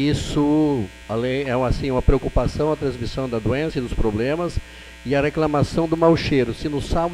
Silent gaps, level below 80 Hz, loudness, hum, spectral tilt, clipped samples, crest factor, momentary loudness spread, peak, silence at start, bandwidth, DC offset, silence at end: none; -30 dBFS; -21 LUFS; none; -7 dB/octave; under 0.1%; 18 dB; 8 LU; -4 dBFS; 0 s; 13 kHz; under 0.1%; 0 s